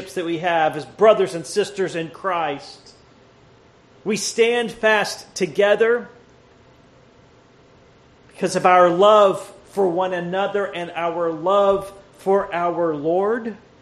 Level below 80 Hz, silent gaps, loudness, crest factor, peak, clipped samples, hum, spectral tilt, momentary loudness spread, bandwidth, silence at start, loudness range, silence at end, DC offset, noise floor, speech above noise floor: -60 dBFS; none; -19 LUFS; 20 dB; -2 dBFS; under 0.1%; none; -4 dB/octave; 12 LU; 13 kHz; 0 s; 6 LU; 0.25 s; under 0.1%; -51 dBFS; 32 dB